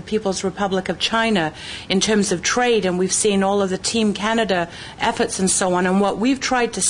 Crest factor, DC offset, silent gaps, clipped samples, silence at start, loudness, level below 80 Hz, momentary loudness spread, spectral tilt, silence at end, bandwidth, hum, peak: 14 dB; under 0.1%; none; under 0.1%; 0 s; -19 LUFS; -48 dBFS; 5 LU; -3.5 dB/octave; 0 s; 10.5 kHz; none; -4 dBFS